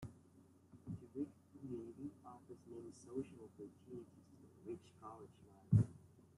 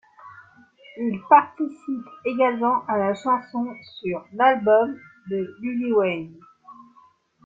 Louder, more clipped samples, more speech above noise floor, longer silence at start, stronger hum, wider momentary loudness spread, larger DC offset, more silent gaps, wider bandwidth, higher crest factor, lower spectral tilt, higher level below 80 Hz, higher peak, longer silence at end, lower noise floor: second, -46 LUFS vs -23 LUFS; neither; second, 25 dB vs 35 dB; second, 0 s vs 0.25 s; neither; first, 26 LU vs 15 LU; neither; neither; first, 11 kHz vs 7.6 kHz; about the same, 26 dB vs 22 dB; first, -9.5 dB/octave vs -7 dB/octave; about the same, -70 dBFS vs -70 dBFS; second, -20 dBFS vs -2 dBFS; second, 0.15 s vs 0.7 s; first, -68 dBFS vs -57 dBFS